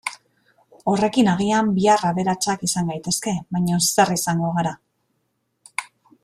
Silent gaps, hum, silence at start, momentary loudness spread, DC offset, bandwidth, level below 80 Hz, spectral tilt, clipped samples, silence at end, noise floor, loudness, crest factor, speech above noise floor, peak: none; none; 0.05 s; 14 LU; under 0.1%; 15 kHz; -58 dBFS; -4.5 dB/octave; under 0.1%; 0.4 s; -72 dBFS; -20 LUFS; 18 dB; 52 dB; -2 dBFS